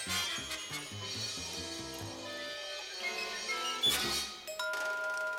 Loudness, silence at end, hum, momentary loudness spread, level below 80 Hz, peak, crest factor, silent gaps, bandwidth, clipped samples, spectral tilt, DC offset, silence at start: -35 LUFS; 0 s; none; 11 LU; -64 dBFS; -20 dBFS; 18 dB; none; 19 kHz; under 0.1%; -1 dB/octave; under 0.1%; 0 s